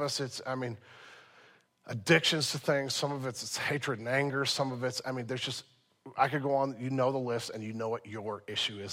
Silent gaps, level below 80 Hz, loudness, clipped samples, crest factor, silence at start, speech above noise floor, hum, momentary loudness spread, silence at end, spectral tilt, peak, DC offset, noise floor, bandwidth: none; -76 dBFS; -32 LUFS; under 0.1%; 24 dB; 0 s; 29 dB; none; 12 LU; 0 s; -4 dB/octave; -10 dBFS; under 0.1%; -62 dBFS; 16 kHz